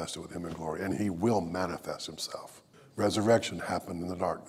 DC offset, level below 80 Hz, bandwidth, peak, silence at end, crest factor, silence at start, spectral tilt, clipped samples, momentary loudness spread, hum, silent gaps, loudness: under 0.1%; -62 dBFS; 16 kHz; -12 dBFS; 0 s; 20 dB; 0 s; -5 dB/octave; under 0.1%; 12 LU; none; none; -32 LUFS